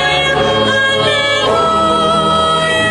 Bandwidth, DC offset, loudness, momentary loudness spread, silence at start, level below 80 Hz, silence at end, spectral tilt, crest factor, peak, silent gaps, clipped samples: 11 kHz; under 0.1%; -11 LUFS; 1 LU; 0 s; -38 dBFS; 0 s; -3.5 dB/octave; 10 dB; -2 dBFS; none; under 0.1%